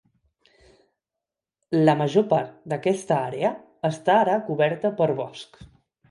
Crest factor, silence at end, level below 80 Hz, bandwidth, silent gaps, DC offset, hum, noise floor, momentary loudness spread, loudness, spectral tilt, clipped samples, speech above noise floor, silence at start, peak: 20 dB; 0.45 s; -64 dBFS; 11.5 kHz; none; under 0.1%; none; -87 dBFS; 11 LU; -23 LUFS; -6.5 dB/octave; under 0.1%; 64 dB; 1.7 s; -4 dBFS